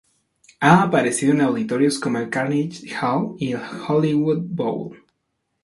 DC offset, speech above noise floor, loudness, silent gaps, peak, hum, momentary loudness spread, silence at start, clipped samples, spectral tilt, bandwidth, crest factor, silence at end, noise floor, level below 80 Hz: under 0.1%; 55 dB; -20 LUFS; none; 0 dBFS; none; 11 LU; 0.6 s; under 0.1%; -6 dB/octave; 11.5 kHz; 20 dB; 0.7 s; -74 dBFS; -62 dBFS